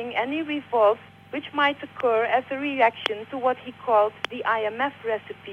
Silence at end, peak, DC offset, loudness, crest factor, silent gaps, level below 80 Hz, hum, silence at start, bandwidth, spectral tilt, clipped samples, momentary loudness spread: 0 s; -8 dBFS; under 0.1%; -25 LUFS; 16 dB; none; -72 dBFS; none; 0 s; 9.4 kHz; -5 dB/octave; under 0.1%; 9 LU